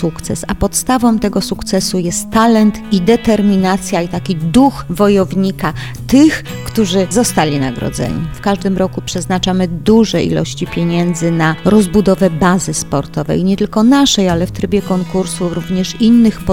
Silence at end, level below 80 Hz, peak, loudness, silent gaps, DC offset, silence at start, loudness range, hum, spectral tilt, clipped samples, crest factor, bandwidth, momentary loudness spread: 0 s; -34 dBFS; 0 dBFS; -13 LUFS; none; 2%; 0 s; 2 LU; none; -5.5 dB/octave; under 0.1%; 12 dB; 17 kHz; 9 LU